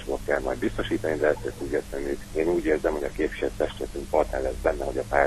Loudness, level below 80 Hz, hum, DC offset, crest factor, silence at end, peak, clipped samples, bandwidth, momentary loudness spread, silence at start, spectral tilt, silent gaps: -27 LUFS; -40 dBFS; none; under 0.1%; 20 dB; 0 s; -6 dBFS; under 0.1%; 13.5 kHz; 6 LU; 0 s; -5.5 dB/octave; none